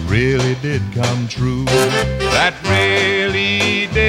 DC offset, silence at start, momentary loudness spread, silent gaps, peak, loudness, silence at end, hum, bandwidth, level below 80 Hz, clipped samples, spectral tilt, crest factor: under 0.1%; 0 s; 5 LU; none; 0 dBFS; -16 LUFS; 0 s; none; 16 kHz; -32 dBFS; under 0.1%; -4.5 dB/octave; 16 dB